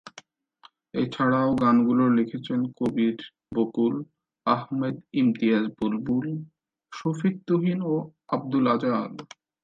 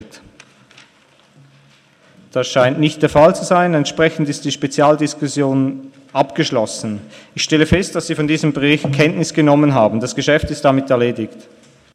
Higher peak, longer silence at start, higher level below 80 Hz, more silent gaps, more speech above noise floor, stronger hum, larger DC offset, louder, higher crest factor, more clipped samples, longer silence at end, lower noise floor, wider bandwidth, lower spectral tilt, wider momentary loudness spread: second, -8 dBFS vs 0 dBFS; about the same, 0.05 s vs 0 s; second, -64 dBFS vs -42 dBFS; neither; about the same, 33 dB vs 36 dB; neither; neither; second, -25 LUFS vs -15 LUFS; about the same, 18 dB vs 16 dB; neither; second, 0.4 s vs 0.55 s; first, -57 dBFS vs -52 dBFS; second, 7.4 kHz vs 12.5 kHz; first, -8 dB/octave vs -5.5 dB/octave; about the same, 12 LU vs 10 LU